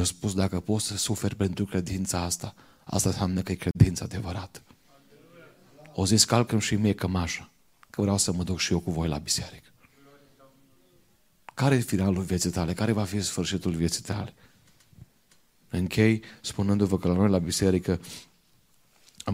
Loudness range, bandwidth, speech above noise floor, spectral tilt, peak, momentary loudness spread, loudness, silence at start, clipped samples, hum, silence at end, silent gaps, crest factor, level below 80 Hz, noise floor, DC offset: 4 LU; 16 kHz; 39 dB; -5 dB/octave; -4 dBFS; 12 LU; -27 LUFS; 0 s; under 0.1%; none; 0 s; none; 22 dB; -48 dBFS; -65 dBFS; under 0.1%